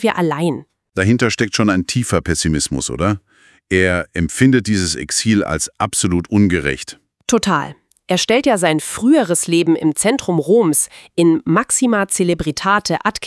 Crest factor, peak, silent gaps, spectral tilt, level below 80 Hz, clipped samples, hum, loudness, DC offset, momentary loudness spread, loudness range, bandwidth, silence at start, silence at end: 16 dB; 0 dBFS; none; -4.5 dB/octave; -42 dBFS; under 0.1%; none; -16 LUFS; under 0.1%; 7 LU; 3 LU; 12 kHz; 0 s; 0 s